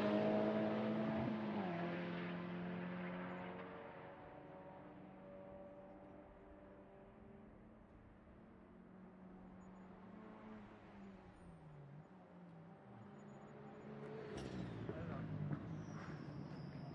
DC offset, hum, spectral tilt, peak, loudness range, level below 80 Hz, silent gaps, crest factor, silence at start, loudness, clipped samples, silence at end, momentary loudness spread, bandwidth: under 0.1%; none; -8 dB/octave; -28 dBFS; 16 LU; -72 dBFS; none; 20 dB; 0 s; -47 LUFS; under 0.1%; 0 s; 20 LU; 8.8 kHz